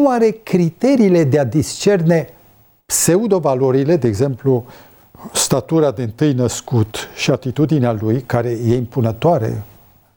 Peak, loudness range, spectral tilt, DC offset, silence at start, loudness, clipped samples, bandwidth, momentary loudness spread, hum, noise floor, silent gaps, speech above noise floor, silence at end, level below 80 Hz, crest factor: 0 dBFS; 3 LU; -5.5 dB/octave; under 0.1%; 0 s; -16 LUFS; under 0.1%; 19.5 kHz; 6 LU; none; -50 dBFS; none; 35 dB; 0.5 s; -48 dBFS; 14 dB